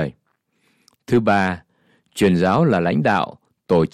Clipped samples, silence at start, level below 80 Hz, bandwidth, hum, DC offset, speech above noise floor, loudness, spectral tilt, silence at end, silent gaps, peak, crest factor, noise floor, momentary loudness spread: under 0.1%; 0 s; -54 dBFS; 14 kHz; none; under 0.1%; 50 dB; -19 LUFS; -7 dB/octave; 0.05 s; none; -4 dBFS; 14 dB; -67 dBFS; 12 LU